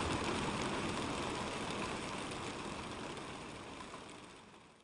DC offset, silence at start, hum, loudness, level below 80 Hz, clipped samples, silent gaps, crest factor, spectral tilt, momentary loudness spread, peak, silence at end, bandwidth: under 0.1%; 0 s; none; -41 LUFS; -58 dBFS; under 0.1%; none; 18 dB; -4 dB/octave; 14 LU; -24 dBFS; 0 s; 11.5 kHz